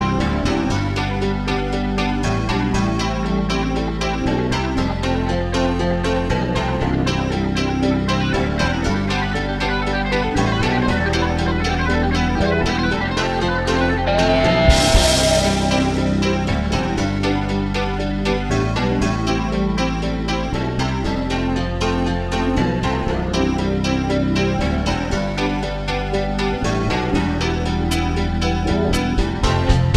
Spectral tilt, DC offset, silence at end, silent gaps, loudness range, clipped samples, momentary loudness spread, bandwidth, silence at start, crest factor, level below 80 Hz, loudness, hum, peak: -5.5 dB/octave; under 0.1%; 0 s; none; 4 LU; under 0.1%; 4 LU; 13 kHz; 0 s; 18 dB; -26 dBFS; -19 LUFS; none; 0 dBFS